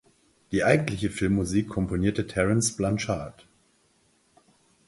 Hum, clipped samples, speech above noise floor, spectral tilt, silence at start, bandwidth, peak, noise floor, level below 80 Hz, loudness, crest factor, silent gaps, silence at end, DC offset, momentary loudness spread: none; under 0.1%; 40 dB; -5.5 dB/octave; 0.5 s; 11.5 kHz; -4 dBFS; -66 dBFS; -46 dBFS; -26 LUFS; 22 dB; none; 1.55 s; under 0.1%; 8 LU